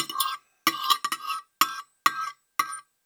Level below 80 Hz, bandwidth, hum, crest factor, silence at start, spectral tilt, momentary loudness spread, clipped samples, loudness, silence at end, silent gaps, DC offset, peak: under -90 dBFS; over 20 kHz; none; 26 dB; 0 s; 0.5 dB/octave; 7 LU; under 0.1%; -27 LUFS; 0.25 s; none; under 0.1%; -2 dBFS